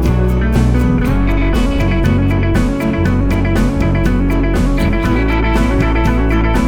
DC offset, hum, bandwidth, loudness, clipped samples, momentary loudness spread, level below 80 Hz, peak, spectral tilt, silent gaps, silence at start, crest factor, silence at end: under 0.1%; none; 15.5 kHz; -14 LUFS; under 0.1%; 1 LU; -16 dBFS; -2 dBFS; -7.5 dB/octave; none; 0 s; 10 dB; 0 s